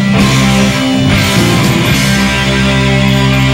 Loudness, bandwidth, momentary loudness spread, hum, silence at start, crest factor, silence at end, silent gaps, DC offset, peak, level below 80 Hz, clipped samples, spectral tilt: -9 LUFS; 16.5 kHz; 2 LU; none; 0 s; 10 dB; 0 s; none; under 0.1%; 0 dBFS; -24 dBFS; under 0.1%; -5 dB/octave